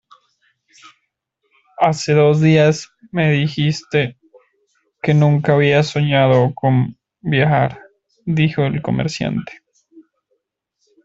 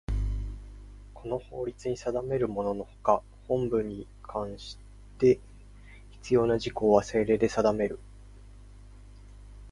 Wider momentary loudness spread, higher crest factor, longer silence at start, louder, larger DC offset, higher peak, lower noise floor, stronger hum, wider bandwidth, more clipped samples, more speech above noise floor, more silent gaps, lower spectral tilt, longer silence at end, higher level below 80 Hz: second, 12 LU vs 19 LU; second, 16 dB vs 22 dB; first, 1.8 s vs 0.1 s; first, -16 LUFS vs -29 LUFS; neither; first, 0 dBFS vs -6 dBFS; first, -71 dBFS vs -49 dBFS; second, none vs 50 Hz at -50 dBFS; second, 7.8 kHz vs 11.5 kHz; neither; first, 56 dB vs 22 dB; neither; about the same, -6.5 dB/octave vs -6.5 dB/octave; first, 1.05 s vs 0 s; second, -52 dBFS vs -42 dBFS